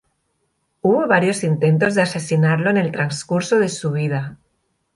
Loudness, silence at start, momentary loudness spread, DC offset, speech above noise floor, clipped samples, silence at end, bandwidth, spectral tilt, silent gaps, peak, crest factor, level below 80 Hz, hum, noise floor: -18 LUFS; 0.85 s; 7 LU; under 0.1%; 52 dB; under 0.1%; 0.6 s; 11.5 kHz; -6 dB/octave; none; -2 dBFS; 16 dB; -60 dBFS; none; -69 dBFS